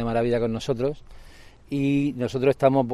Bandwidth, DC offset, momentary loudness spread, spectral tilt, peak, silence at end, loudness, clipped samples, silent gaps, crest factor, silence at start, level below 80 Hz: 12.5 kHz; under 0.1%; 8 LU; -7.5 dB/octave; -6 dBFS; 0 s; -24 LUFS; under 0.1%; none; 18 dB; 0 s; -46 dBFS